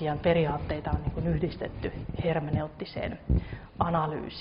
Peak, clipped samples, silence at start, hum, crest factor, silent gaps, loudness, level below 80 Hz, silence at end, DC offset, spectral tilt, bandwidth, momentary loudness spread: -10 dBFS; under 0.1%; 0 s; none; 18 dB; none; -30 LUFS; -40 dBFS; 0 s; under 0.1%; -6.5 dB/octave; 5.4 kHz; 10 LU